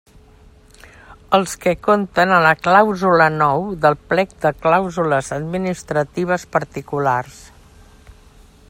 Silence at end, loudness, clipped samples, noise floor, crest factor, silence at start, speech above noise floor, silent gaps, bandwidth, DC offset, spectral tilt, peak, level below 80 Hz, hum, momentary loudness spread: 1.4 s; -17 LUFS; under 0.1%; -47 dBFS; 18 dB; 1.1 s; 30 dB; none; 16 kHz; under 0.1%; -5.5 dB/octave; 0 dBFS; -48 dBFS; none; 9 LU